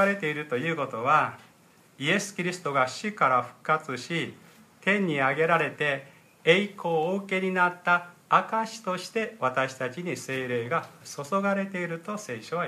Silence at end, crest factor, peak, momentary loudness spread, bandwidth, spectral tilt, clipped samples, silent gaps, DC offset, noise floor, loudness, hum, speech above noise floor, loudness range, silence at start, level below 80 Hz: 0 s; 22 dB; -6 dBFS; 9 LU; 15 kHz; -4.5 dB/octave; under 0.1%; none; under 0.1%; -58 dBFS; -27 LUFS; none; 31 dB; 4 LU; 0 s; -78 dBFS